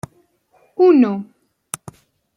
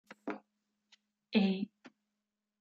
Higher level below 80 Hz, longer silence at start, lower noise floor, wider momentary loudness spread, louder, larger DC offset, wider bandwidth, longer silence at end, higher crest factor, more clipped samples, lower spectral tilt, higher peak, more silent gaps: first, -62 dBFS vs -82 dBFS; first, 0.8 s vs 0.1 s; second, -58 dBFS vs -88 dBFS; first, 22 LU vs 14 LU; first, -15 LUFS vs -35 LUFS; neither; first, 14 kHz vs 6.6 kHz; first, 1.15 s vs 0.75 s; second, 16 dB vs 22 dB; neither; second, -6 dB/octave vs -8 dB/octave; first, -2 dBFS vs -16 dBFS; neither